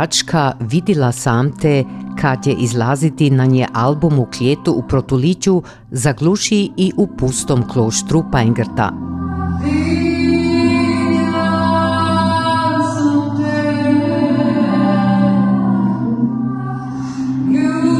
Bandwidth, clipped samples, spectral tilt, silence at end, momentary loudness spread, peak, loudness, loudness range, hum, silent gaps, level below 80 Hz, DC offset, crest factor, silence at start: 13.5 kHz; under 0.1%; -6 dB/octave; 0 s; 5 LU; -2 dBFS; -15 LUFS; 1 LU; none; none; -42 dBFS; under 0.1%; 12 dB; 0 s